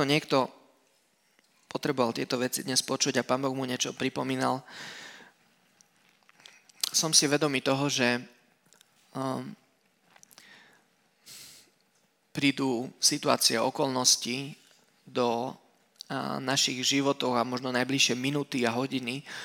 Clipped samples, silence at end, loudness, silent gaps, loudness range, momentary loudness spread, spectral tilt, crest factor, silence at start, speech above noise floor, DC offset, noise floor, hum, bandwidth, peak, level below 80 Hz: under 0.1%; 0 s; -27 LUFS; none; 9 LU; 17 LU; -2.5 dB/octave; 26 dB; 0 s; 41 dB; under 0.1%; -70 dBFS; none; 17.5 kHz; -4 dBFS; -80 dBFS